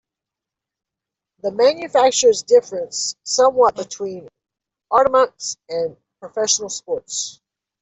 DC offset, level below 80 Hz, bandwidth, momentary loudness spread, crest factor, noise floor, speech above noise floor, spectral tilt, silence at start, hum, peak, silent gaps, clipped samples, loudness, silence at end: under 0.1%; -62 dBFS; 8.4 kHz; 14 LU; 16 dB; -86 dBFS; 68 dB; -1.5 dB/octave; 1.45 s; none; -4 dBFS; none; under 0.1%; -18 LUFS; 0.5 s